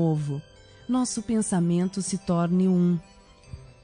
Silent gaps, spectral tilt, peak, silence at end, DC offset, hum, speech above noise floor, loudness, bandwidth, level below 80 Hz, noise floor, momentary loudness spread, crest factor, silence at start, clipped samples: none; -6.5 dB/octave; -12 dBFS; 0.1 s; under 0.1%; none; 21 dB; -25 LUFS; 10 kHz; -54 dBFS; -45 dBFS; 21 LU; 14 dB; 0 s; under 0.1%